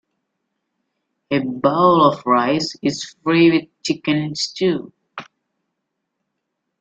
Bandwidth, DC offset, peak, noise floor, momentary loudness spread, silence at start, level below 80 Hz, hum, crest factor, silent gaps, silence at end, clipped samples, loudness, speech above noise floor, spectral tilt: 8.2 kHz; under 0.1%; -2 dBFS; -77 dBFS; 13 LU; 1.3 s; -60 dBFS; none; 18 dB; none; 1.6 s; under 0.1%; -18 LUFS; 60 dB; -5.5 dB/octave